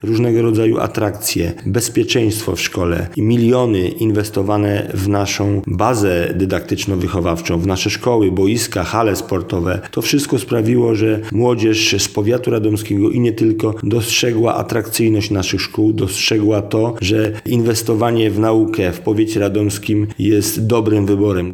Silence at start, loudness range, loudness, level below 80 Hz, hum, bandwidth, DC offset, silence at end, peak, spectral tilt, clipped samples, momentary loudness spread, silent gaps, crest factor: 0 s; 2 LU; -16 LUFS; -46 dBFS; none; 19 kHz; under 0.1%; 0 s; 0 dBFS; -5.5 dB/octave; under 0.1%; 5 LU; none; 16 dB